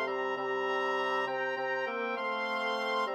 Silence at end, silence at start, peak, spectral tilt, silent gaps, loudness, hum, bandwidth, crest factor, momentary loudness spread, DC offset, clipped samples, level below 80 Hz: 0 s; 0 s; -20 dBFS; -3.5 dB/octave; none; -32 LUFS; none; 15 kHz; 14 dB; 2 LU; under 0.1%; under 0.1%; under -90 dBFS